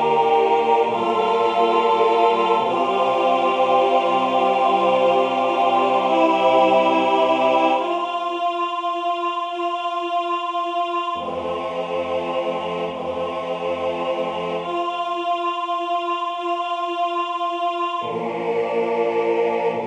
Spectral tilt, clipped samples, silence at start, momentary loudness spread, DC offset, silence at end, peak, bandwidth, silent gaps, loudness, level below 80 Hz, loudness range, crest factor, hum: -5 dB/octave; under 0.1%; 0 s; 8 LU; under 0.1%; 0 s; -4 dBFS; 10 kHz; none; -20 LUFS; -64 dBFS; 7 LU; 16 dB; none